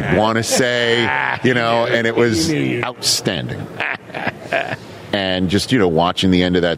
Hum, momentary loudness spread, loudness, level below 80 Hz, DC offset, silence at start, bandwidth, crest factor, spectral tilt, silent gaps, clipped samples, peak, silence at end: none; 8 LU; -17 LUFS; -46 dBFS; under 0.1%; 0 s; 16 kHz; 14 dB; -4 dB/octave; none; under 0.1%; -2 dBFS; 0 s